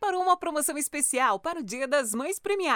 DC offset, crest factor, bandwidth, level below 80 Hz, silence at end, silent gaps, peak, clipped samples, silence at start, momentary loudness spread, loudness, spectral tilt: under 0.1%; 16 dB; over 20 kHz; -68 dBFS; 0 s; none; -12 dBFS; under 0.1%; 0 s; 6 LU; -27 LUFS; -1.5 dB/octave